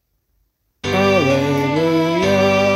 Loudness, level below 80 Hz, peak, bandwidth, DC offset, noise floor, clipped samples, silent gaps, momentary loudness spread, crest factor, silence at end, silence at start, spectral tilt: -16 LUFS; -50 dBFS; -4 dBFS; 15.5 kHz; under 0.1%; -66 dBFS; under 0.1%; none; 4 LU; 14 dB; 0 s; 0.85 s; -5.5 dB/octave